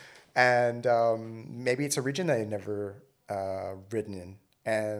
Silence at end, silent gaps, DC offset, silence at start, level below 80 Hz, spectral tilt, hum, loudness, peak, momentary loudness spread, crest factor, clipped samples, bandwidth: 0 s; none; under 0.1%; 0 s; -76 dBFS; -4.5 dB/octave; none; -29 LUFS; -8 dBFS; 16 LU; 22 dB; under 0.1%; 14.5 kHz